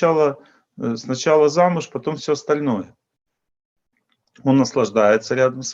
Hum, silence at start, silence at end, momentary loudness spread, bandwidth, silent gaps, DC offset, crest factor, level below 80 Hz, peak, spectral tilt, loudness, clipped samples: none; 0 s; 0 s; 11 LU; 7.8 kHz; 3.65-3.76 s; under 0.1%; 18 dB; -68 dBFS; -2 dBFS; -5.5 dB/octave; -19 LUFS; under 0.1%